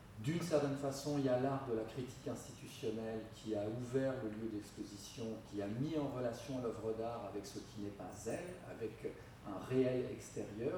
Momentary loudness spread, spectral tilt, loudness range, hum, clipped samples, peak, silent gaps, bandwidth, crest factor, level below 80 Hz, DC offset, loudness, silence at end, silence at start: 12 LU; -6 dB/octave; 4 LU; none; under 0.1%; -22 dBFS; none; 19 kHz; 18 dB; -66 dBFS; under 0.1%; -42 LUFS; 0 s; 0 s